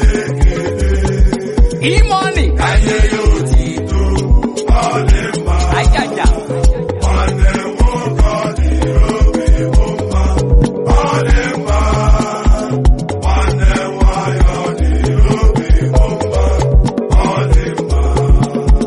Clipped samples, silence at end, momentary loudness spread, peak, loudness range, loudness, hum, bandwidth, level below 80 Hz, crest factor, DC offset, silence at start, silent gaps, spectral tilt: under 0.1%; 0 s; 3 LU; 0 dBFS; 1 LU; -14 LUFS; none; 11.5 kHz; -12 dBFS; 10 dB; under 0.1%; 0 s; none; -6 dB/octave